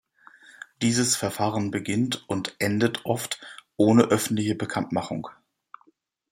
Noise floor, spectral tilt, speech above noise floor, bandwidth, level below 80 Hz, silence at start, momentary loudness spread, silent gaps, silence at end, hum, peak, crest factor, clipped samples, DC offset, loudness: -64 dBFS; -4.5 dB/octave; 39 dB; 16 kHz; -64 dBFS; 0.8 s; 15 LU; none; 1 s; none; -4 dBFS; 22 dB; under 0.1%; under 0.1%; -25 LUFS